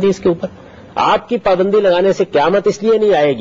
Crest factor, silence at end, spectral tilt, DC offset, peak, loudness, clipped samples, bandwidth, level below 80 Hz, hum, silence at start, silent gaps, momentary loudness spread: 10 dB; 0 s; -6 dB/octave; under 0.1%; -2 dBFS; -14 LUFS; under 0.1%; 7.6 kHz; -46 dBFS; none; 0 s; none; 6 LU